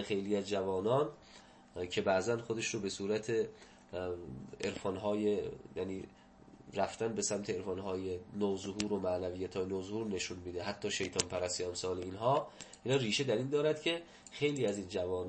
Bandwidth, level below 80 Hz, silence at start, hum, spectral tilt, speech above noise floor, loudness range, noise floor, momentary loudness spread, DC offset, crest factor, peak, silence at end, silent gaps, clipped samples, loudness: 8.8 kHz; -66 dBFS; 0 s; none; -4.5 dB/octave; 22 dB; 4 LU; -59 dBFS; 10 LU; under 0.1%; 28 dB; -8 dBFS; 0 s; none; under 0.1%; -36 LUFS